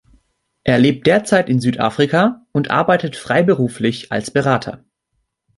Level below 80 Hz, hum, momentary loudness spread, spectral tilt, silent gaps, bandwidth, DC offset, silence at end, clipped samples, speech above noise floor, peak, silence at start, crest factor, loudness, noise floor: -52 dBFS; none; 7 LU; -6 dB/octave; none; 11.5 kHz; under 0.1%; 0.8 s; under 0.1%; 55 dB; -2 dBFS; 0.65 s; 16 dB; -16 LUFS; -71 dBFS